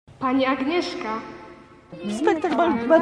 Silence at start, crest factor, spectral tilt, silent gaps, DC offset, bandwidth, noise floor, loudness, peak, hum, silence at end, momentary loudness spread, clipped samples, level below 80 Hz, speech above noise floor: 0.1 s; 18 dB; -5 dB/octave; none; under 0.1%; 10.5 kHz; -45 dBFS; -23 LUFS; -6 dBFS; none; 0 s; 17 LU; under 0.1%; -58 dBFS; 24 dB